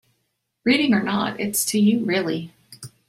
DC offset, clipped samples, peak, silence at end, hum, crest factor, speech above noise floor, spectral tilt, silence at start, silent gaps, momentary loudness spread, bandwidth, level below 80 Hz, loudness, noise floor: under 0.1%; under 0.1%; -6 dBFS; 0.2 s; none; 16 dB; 53 dB; -4 dB/octave; 0.65 s; none; 19 LU; 16 kHz; -62 dBFS; -21 LUFS; -74 dBFS